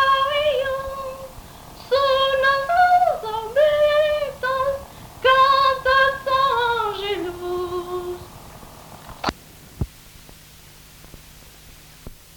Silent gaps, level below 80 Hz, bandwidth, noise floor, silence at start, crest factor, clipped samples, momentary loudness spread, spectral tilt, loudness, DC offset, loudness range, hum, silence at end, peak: none; -46 dBFS; 19 kHz; -45 dBFS; 0 s; 18 dB; under 0.1%; 24 LU; -4 dB/octave; -20 LUFS; under 0.1%; 17 LU; none; 0.2 s; -4 dBFS